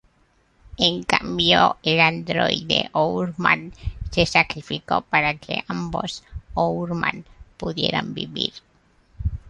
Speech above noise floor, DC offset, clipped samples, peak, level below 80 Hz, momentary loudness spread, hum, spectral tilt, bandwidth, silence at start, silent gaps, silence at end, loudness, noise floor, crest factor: 39 dB; under 0.1%; under 0.1%; -2 dBFS; -40 dBFS; 13 LU; none; -4.5 dB/octave; 11.5 kHz; 0.65 s; none; 0 s; -21 LUFS; -61 dBFS; 22 dB